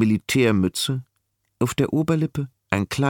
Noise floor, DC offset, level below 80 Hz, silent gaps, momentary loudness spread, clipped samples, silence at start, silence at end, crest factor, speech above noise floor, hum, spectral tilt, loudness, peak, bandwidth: -73 dBFS; under 0.1%; -52 dBFS; none; 8 LU; under 0.1%; 0 s; 0 s; 18 dB; 52 dB; none; -5.5 dB/octave; -23 LUFS; -4 dBFS; 18 kHz